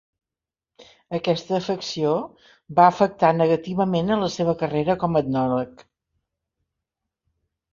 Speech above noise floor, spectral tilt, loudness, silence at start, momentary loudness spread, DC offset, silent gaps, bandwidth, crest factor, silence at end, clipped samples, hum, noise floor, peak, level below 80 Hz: 68 dB; -6.5 dB/octave; -22 LUFS; 0.8 s; 10 LU; under 0.1%; none; 7.4 kHz; 22 dB; 2.05 s; under 0.1%; none; -89 dBFS; -2 dBFS; -58 dBFS